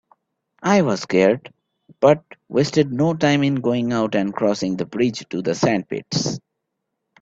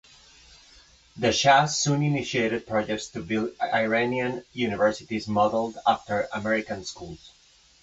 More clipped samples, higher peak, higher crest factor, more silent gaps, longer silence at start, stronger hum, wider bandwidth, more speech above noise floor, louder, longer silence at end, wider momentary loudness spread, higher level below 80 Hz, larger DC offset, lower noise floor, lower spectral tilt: neither; first, 0 dBFS vs -6 dBFS; about the same, 20 dB vs 20 dB; neither; second, 0.6 s vs 1.15 s; neither; about the same, 7.8 kHz vs 8.2 kHz; first, 59 dB vs 30 dB; first, -20 LUFS vs -25 LUFS; first, 0.85 s vs 0.55 s; second, 7 LU vs 12 LU; about the same, -58 dBFS vs -56 dBFS; neither; first, -78 dBFS vs -55 dBFS; about the same, -5.5 dB/octave vs -4.5 dB/octave